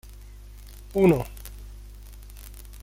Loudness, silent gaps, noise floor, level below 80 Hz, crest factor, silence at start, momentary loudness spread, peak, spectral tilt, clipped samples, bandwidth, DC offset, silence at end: -23 LUFS; none; -43 dBFS; -42 dBFS; 20 dB; 0.35 s; 26 LU; -8 dBFS; -7.5 dB/octave; under 0.1%; 16.5 kHz; under 0.1%; 0.05 s